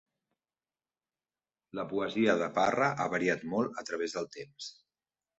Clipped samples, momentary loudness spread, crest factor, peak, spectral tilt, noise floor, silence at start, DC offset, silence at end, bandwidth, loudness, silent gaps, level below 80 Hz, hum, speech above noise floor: under 0.1%; 16 LU; 22 dB; -12 dBFS; -5 dB/octave; under -90 dBFS; 1.75 s; under 0.1%; 0.65 s; 8.2 kHz; -31 LUFS; none; -72 dBFS; none; over 59 dB